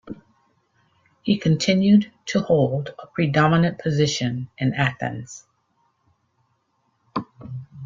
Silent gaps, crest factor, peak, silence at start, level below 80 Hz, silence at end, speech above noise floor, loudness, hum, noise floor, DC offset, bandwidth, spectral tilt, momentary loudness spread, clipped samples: none; 20 dB; -4 dBFS; 0.05 s; -58 dBFS; 0 s; 49 dB; -21 LUFS; none; -69 dBFS; under 0.1%; 7.6 kHz; -6 dB/octave; 19 LU; under 0.1%